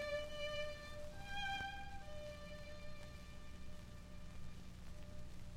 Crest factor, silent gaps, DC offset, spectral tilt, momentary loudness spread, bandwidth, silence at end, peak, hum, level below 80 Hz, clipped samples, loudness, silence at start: 16 dB; none; under 0.1%; -4 dB/octave; 12 LU; 15.5 kHz; 0 s; -32 dBFS; 60 Hz at -60 dBFS; -54 dBFS; under 0.1%; -50 LUFS; 0 s